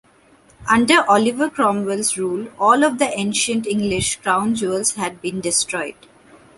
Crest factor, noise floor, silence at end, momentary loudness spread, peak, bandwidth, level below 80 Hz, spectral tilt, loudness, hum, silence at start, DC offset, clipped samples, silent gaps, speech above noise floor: 18 dB; -52 dBFS; 0.65 s; 11 LU; -2 dBFS; 12 kHz; -52 dBFS; -3 dB/octave; -18 LUFS; none; 0.6 s; under 0.1%; under 0.1%; none; 34 dB